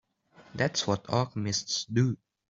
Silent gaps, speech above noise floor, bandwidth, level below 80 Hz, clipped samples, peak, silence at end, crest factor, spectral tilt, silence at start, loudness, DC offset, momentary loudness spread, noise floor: none; 30 dB; 7.8 kHz; -64 dBFS; under 0.1%; -12 dBFS; 0.35 s; 20 dB; -4.5 dB/octave; 0.4 s; -29 LUFS; under 0.1%; 4 LU; -58 dBFS